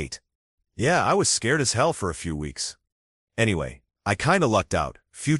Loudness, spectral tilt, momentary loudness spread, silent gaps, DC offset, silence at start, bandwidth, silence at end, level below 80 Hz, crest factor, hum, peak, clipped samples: -24 LUFS; -4 dB/octave; 12 LU; 0.35-0.58 s, 2.92-3.27 s; under 0.1%; 0 s; 12 kHz; 0 s; -46 dBFS; 20 dB; none; -6 dBFS; under 0.1%